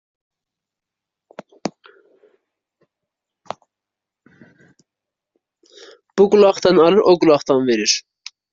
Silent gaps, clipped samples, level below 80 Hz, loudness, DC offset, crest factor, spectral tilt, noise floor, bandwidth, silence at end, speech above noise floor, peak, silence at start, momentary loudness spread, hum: none; under 0.1%; -60 dBFS; -14 LUFS; under 0.1%; 20 dB; -4 dB/octave; -85 dBFS; 7.6 kHz; 0.5 s; 72 dB; 0 dBFS; 1.65 s; 23 LU; none